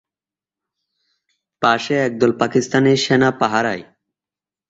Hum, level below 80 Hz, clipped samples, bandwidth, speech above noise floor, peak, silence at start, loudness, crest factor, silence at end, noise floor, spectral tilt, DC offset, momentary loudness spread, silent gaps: 50 Hz at -60 dBFS; -58 dBFS; under 0.1%; 8 kHz; over 74 dB; -2 dBFS; 1.6 s; -17 LUFS; 18 dB; 0.85 s; under -90 dBFS; -5 dB/octave; under 0.1%; 5 LU; none